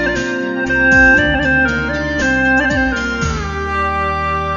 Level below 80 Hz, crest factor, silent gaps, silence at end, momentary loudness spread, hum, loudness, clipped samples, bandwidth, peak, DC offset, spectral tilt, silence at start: -28 dBFS; 14 dB; none; 0 s; 10 LU; none; -14 LUFS; under 0.1%; 7.4 kHz; 0 dBFS; under 0.1%; -5 dB/octave; 0 s